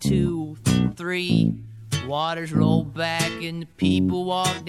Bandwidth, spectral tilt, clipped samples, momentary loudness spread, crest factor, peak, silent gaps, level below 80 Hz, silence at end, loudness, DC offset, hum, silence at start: 16.5 kHz; -5.5 dB/octave; under 0.1%; 8 LU; 16 dB; -8 dBFS; none; -46 dBFS; 0 s; -23 LUFS; under 0.1%; none; 0 s